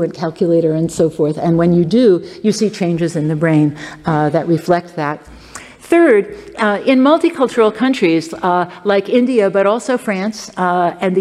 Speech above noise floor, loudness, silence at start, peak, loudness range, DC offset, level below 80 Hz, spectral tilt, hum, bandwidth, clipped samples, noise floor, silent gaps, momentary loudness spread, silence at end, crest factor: 21 dB; -15 LUFS; 0 s; -2 dBFS; 3 LU; under 0.1%; -50 dBFS; -6.5 dB/octave; none; 13 kHz; under 0.1%; -35 dBFS; none; 9 LU; 0 s; 12 dB